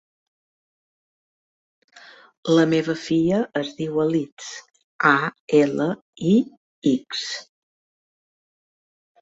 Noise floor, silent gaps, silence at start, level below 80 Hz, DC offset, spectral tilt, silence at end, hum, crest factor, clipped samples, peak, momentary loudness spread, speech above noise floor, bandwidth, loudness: -48 dBFS; 2.37-2.43 s, 4.32-4.37 s, 4.84-4.99 s, 5.40-5.48 s, 6.02-6.13 s, 6.57-6.82 s; 1.95 s; -66 dBFS; under 0.1%; -5.5 dB/octave; 1.8 s; none; 22 dB; under 0.1%; -2 dBFS; 15 LU; 27 dB; 8 kHz; -22 LUFS